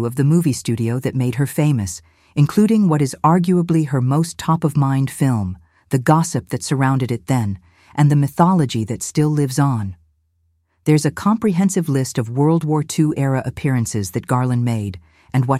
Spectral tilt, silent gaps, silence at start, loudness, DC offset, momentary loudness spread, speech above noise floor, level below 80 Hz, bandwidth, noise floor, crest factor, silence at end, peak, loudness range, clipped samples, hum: -6.5 dB/octave; none; 0 s; -18 LUFS; under 0.1%; 8 LU; 47 dB; -52 dBFS; 15.5 kHz; -64 dBFS; 16 dB; 0 s; -2 dBFS; 2 LU; under 0.1%; none